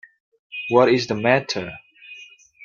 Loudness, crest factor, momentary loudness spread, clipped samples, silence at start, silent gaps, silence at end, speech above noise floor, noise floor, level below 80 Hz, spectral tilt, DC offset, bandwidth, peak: -20 LUFS; 20 dB; 24 LU; under 0.1%; 0.5 s; none; 0 s; 27 dB; -45 dBFS; -62 dBFS; -5.5 dB/octave; under 0.1%; 7.4 kHz; -2 dBFS